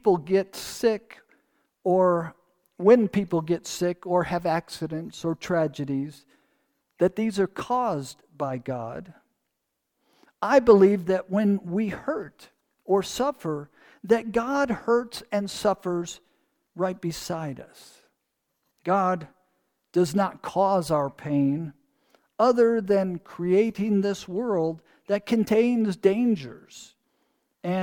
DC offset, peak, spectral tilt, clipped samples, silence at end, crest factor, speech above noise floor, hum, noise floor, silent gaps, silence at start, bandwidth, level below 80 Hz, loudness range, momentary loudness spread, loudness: under 0.1%; -4 dBFS; -6.5 dB/octave; under 0.1%; 0 s; 20 dB; 56 dB; none; -80 dBFS; none; 0.05 s; 19 kHz; -60 dBFS; 7 LU; 13 LU; -25 LUFS